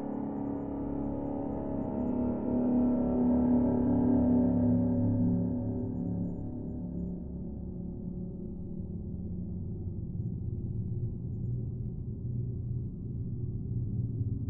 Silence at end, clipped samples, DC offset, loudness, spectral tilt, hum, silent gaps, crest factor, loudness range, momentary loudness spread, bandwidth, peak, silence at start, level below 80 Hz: 0 s; under 0.1%; under 0.1%; -33 LUFS; -14 dB/octave; none; none; 16 dB; 11 LU; 12 LU; 2.4 kHz; -16 dBFS; 0 s; -46 dBFS